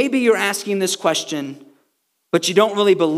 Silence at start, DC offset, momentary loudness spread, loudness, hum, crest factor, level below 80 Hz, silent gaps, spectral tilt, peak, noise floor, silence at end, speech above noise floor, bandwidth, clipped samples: 0 s; under 0.1%; 10 LU; -18 LUFS; none; 18 dB; -86 dBFS; none; -3.5 dB/octave; 0 dBFS; -69 dBFS; 0 s; 51 dB; 16 kHz; under 0.1%